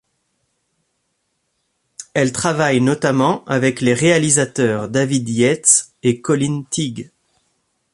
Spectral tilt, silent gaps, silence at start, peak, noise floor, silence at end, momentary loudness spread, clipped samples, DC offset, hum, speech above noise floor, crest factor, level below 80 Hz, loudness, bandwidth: -4 dB/octave; none; 2 s; 0 dBFS; -70 dBFS; 0.9 s; 9 LU; under 0.1%; under 0.1%; none; 54 dB; 18 dB; -56 dBFS; -16 LUFS; 11.5 kHz